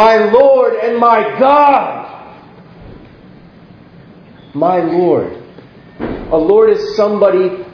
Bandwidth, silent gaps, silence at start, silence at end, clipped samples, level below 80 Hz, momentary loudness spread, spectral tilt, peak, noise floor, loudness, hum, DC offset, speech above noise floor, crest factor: 5.4 kHz; none; 0 s; 0.05 s; 0.2%; -44 dBFS; 17 LU; -7 dB/octave; 0 dBFS; -39 dBFS; -11 LUFS; none; under 0.1%; 29 dB; 12 dB